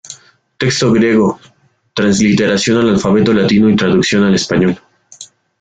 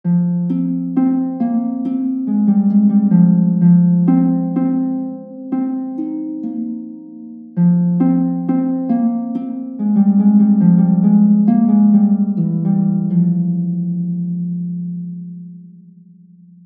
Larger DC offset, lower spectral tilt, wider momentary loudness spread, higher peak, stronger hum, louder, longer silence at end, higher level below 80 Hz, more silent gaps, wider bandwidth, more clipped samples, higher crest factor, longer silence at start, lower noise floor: neither; second, -5 dB/octave vs -14.5 dB/octave; second, 8 LU vs 14 LU; about the same, -2 dBFS vs -2 dBFS; neither; first, -12 LUFS vs -15 LUFS; second, 0.35 s vs 0.95 s; first, -44 dBFS vs -64 dBFS; neither; first, 9.2 kHz vs 2.2 kHz; neither; about the same, 12 dB vs 14 dB; about the same, 0.1 s vs 0.05 s; second, -38 dBFS vs -44 dBFS